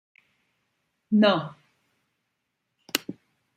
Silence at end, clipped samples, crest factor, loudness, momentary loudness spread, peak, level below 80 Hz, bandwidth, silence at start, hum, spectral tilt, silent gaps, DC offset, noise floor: 0.45 s; under 0.1%; 28 dB; -24 LUFS; 19 LU; -2 dBFS; -76 dBFS; 16 kHz; 1.1 s; none; -5 dB/octave; none; under 0.1%; -79 dBFS